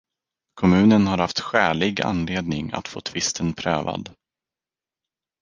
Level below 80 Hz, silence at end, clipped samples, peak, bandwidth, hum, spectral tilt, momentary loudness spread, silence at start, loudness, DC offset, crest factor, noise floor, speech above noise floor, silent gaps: -46 dBFS; 1.3 s; under 0.1%; -2 dBFS; 9.8 kHz; none; -5 dB/octave; 13 LU; 0.55 s; -21 LUFS; under 0.1%; 20 dB; under -90 dBFS; over 69 dB; none